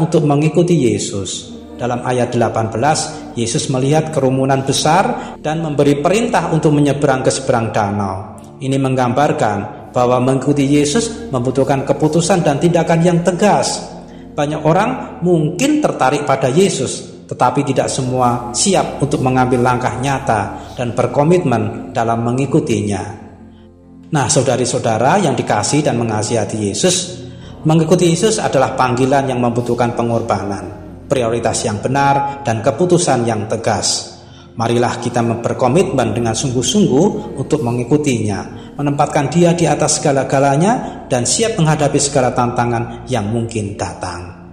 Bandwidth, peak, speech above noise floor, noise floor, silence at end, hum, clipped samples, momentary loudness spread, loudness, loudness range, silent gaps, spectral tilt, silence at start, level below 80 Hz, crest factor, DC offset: 15.5 kHz; 0 dBFS; 26 dB; -40 dBFS; 0 s; none; under 0.1%; 9 LU; -15 LUFS; 2 LU; none; -5 dB/octave; 0 s; -44 dBFS; 14 dB; 0.1%